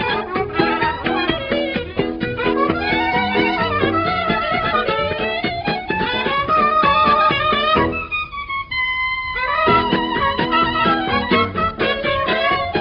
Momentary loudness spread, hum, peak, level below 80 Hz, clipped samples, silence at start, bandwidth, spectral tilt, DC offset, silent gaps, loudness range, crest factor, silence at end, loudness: 7 LU; none; -4 dBFS; -40 dBFS; under 0.1%; 0 s; 6.2 kHz; -7.5 dB/octave; under 0.1%; none; 2 LU; 16 dB; 0 s; -18 LUFS